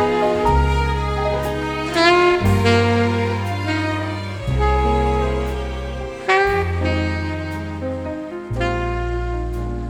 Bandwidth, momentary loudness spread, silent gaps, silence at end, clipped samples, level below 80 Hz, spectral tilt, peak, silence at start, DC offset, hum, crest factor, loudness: 16 kHz; 11 LU; none; 0 s; under 0.1%; -26 dBFS; -6.5 dB/octave; -2 dBFS; 0 s; under 0.1%; none; 18 dB; -20 LUFS